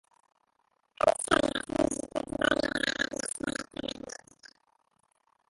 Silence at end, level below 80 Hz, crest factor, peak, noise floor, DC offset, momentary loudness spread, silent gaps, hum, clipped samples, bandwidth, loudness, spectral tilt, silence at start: 1 s; -56 dBFS; 22 dB; -10 dBFS; -74 dBFS; under 0.1%; 12 LU; none; none; under 0.1%; 12 kHz; -30 LUFS; -3 dB/octave; 1 s